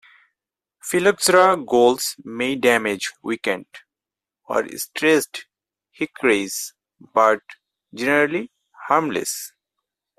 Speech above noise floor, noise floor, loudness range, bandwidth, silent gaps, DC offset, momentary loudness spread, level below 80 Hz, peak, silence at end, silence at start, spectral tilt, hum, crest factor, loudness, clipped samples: 69 dB; -89 dBFS; 5 LU; 16 kHz; none; under 0.1%; 14 LU; -66 dBFS; -2 dBFS; 0.7 s; 0.85 s; -3 dB/octave; none; 20 dB; -20 LUFS; under 0.1%